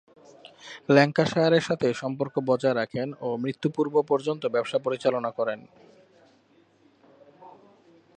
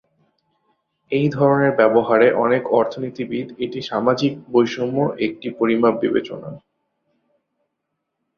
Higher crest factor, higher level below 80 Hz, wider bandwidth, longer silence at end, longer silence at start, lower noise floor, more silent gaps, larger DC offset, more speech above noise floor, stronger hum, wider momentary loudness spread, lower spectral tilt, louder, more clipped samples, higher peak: first, 24 dB vs 18 dB; second, -70 dBFS vs -62 dBFS; first, 10 kHz vs 6.8 kHz; second, 0.65 s vs 1.8 s; second, 0.65 s vs 1.1 s; second, -61 dBFS vs -77 dBFS; neither; neither; second, 36 dB vs 59 dB; neither; about the same, 10 LU vs 12 LU; about the same, -6.5 dB/octave vs -7 dB/octave; second, -25 LUFS vs -19 LUFS; neither; about the same, -4 dBFS vs -2 dBFS